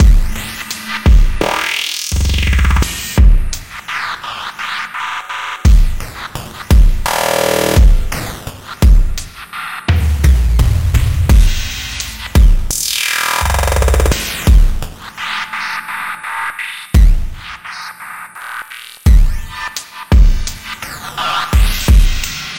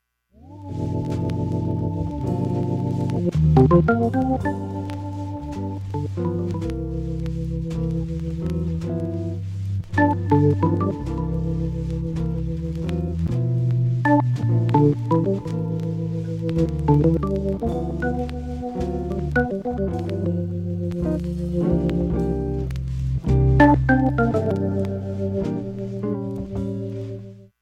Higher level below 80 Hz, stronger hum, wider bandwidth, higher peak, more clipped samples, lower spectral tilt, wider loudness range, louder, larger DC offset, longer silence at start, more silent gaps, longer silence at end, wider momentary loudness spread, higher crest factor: first, -14 dBFS vs -34 dBFS; neither; first, 17 kHz vs 9 kHz; about the same, 0 dBFS vs -2 dBFS; neither; second, -4.5 dB/octave vs -9.5 dB/octave; about the same, 5 LU vs 6 LU; first, -15 LUFS vs -23 LUFS; neither; second, 0 s vs 0.45 s; neither; second, 0 s vs 0.15 s; first, 14 LU vs 10 LU; second, 12 dB vs 20 dB